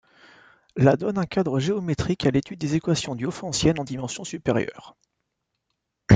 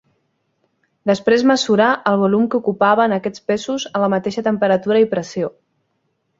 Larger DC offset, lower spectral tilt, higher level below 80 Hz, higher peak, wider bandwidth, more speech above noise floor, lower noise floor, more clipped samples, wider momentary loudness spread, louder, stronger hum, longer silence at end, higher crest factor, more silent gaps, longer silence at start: neither; about the same, -6 dB/octave vs -5.5 dB/octave; first, -48 dBFS vs -60 dBFS; about the same, -2 dBFS vs -2 dBFS; first, 9.6 kHz vs 7.8 kHz; about the same, 55 dB vs 52 dB; first, -79 dBFS vs -69 dBFS; neither; about the same, 10 LU vs 8 LU; second, -24 LUFS vs -17 LUFS; neither; second, 0 s vs 0.9 s; first, 24 dB vs 16 dB; neither; second, 0.75 s vs 1.05 s